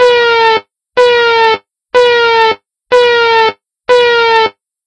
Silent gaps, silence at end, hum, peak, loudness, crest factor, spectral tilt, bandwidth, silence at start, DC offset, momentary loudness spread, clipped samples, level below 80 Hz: none; 0.35 s; none; 0 dBFS; -9 LUFS; 10 dB; -2 dB/octave; 9.4 kHz; 0 s; under 0.1%; 8 LU; 0.4%; -52 dBFS